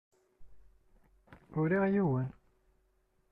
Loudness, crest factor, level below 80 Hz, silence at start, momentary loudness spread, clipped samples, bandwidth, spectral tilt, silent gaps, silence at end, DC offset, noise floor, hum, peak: -32 LUFS; 16 dB; -64 dBFS; 0.4 s; 12 LU; under 0.1%; 3.9 kHz; -11 dB/octave; none; 1 s; under 0.1%; -73 dBFS; none; -20 dBFS